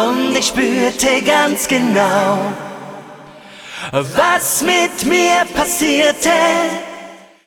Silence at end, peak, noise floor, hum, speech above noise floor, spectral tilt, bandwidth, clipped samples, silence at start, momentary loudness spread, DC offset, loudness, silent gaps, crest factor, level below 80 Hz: 0.3 s; 0 dBFS; -37 dBFS; none; 23 dB; -2.5 dB/octave; over 20 kHz; under 0.1%; 0 s; 18 LU; under 0.1%; -14 LUFS; none; 14 dB; -46 dBFS